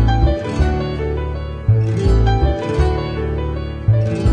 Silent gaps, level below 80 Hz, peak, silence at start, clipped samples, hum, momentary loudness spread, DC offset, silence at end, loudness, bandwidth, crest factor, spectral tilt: none; -20 dBFS; -4 dBFS; 0 s; under 0.1%; none; 7 LU; under 0.1%; 0 s; -18 LUFS; 9 kHz; 12 dB; -8 dB/octave